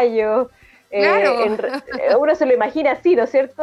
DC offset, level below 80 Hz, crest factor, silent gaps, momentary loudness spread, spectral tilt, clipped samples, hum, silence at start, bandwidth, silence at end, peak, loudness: under 0.1%; -58 dBFS; 14 dB; none; 8 LU; -5.5 dB/octave; under 0.1%; none; 0 s; 11.5 kHz; 0 s; -4 dBFS; -17 LUFS